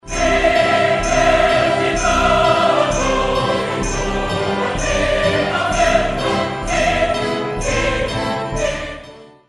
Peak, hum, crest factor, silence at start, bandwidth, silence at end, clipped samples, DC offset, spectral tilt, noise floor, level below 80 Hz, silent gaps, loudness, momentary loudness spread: -2 dBFS; none; 16 dB; 0.05 s; 11.5 kHz; 0.25 s; under 0.1%; under 0.1%; -4 dB/octave; -39 dBFS; -30 dBFS; none; -17 LUFS; 7 LU